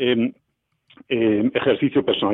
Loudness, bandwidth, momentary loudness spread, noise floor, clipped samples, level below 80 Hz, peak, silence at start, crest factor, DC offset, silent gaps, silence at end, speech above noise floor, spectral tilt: -21 LUFS; 4 kHz; 6 LU; -62 dBFS; under 0.1%; -58 dBFS; -8 dBFS; 0 s; 14 dB; under 0.1%; none; 0 s; 42 dB; -9 dB/octave